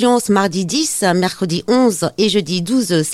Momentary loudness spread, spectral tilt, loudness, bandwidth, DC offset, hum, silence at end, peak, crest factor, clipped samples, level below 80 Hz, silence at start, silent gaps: 4 LU; -4.5 dB/octave; -16 LUFS; 15.5 kHz; under 0.1%; none; 0 s; -2 dBFS; 14 dB; under 0.1%; -54 dBFS; 0 s; none